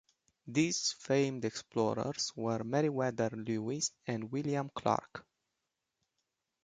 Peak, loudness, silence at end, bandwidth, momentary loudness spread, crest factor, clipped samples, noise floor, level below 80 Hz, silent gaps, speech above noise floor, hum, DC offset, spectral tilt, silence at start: -16 dBFS; -34 LUFS; 1.45 s; 9.6 kHz; 6 LU; 20 dB; under 0.1%; -87 dBFS; -72 dBFS; none; 52 dB; none; under 0.1%; -4.5 dB/octave; 0.45 s